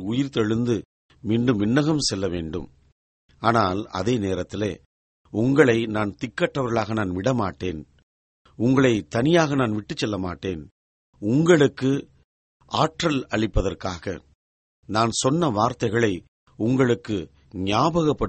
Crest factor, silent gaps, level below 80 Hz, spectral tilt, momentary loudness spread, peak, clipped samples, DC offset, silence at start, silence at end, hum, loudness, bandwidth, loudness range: 20 dB; 0.85-1.09 s, 2.92-3.29 s, 4.86-5.25 s, 8.03-8.45 s, 10.71-11.13 s, 12.24-12.60 s, 14.35-14.83 s, 16.28-16.46 s; -44 dBFS; -5.5 dB/octave; 13 LU; -2 dBFS; under 0.1%; under 0.1%; 0 s; 0 s; none; -23 LUFS; 8.8 kHz; 3 LU